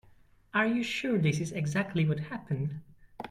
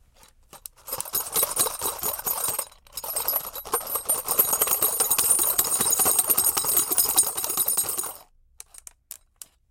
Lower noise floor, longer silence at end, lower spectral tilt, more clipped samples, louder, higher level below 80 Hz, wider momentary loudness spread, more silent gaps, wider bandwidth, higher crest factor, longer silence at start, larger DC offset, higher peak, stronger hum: first, -60 dBFS vs -56 dBFS; second, 0 s vs 0.95 s; first, -6 dB/octave vs 0 dB/octave; neither; second, -31 LUFS vs -22 LUFS; second, -62 dBFS vs -56 dBFS; second, 8 LU vs 13 LU; neither; second, 12 kHz vs 17.5 kHz; second, 16 dB vs 22 dB; about the same, 0.55 s vs 0.55 s; neither; second, -14 dBFS vs -4 dBFS; neither